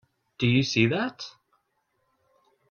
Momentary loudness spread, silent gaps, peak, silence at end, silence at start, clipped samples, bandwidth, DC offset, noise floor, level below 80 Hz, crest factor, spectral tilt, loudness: 18 LU; none; -6 dBFS; 1.4 s; 0.4 s; under 0.1%; 7 kHz; under 0.1%; -74 dBFS; -62 dBFS; 22 dB; -5.5 dB/octave; -25 LUFS